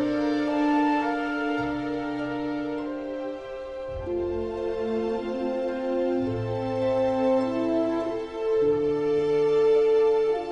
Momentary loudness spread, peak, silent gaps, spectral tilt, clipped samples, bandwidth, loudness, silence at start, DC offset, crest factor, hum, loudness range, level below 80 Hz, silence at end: 10 LU; -14 dBFS; none; -7.5 dB/octave; under 0.1%; 8.4 kHz; -26 LUFS; 0 s; under 0.1%; 12 dB; none; 7 LU; -52 dBFS; 0 s